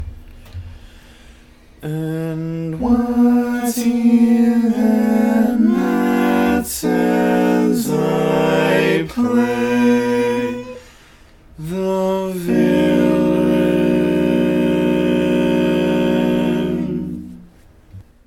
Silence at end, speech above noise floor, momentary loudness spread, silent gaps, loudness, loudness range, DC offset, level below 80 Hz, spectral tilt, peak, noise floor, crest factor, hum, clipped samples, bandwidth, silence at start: 0.25 s; 29 dB; 10 LU; none; -16 LUFS; 4 LU; under 0.1%; -42 dBFS; -6.5 dB/octave; -2 dBFS; -45 dBFS; 14 dB; none; under 0.1%; 18 kHz; 0 s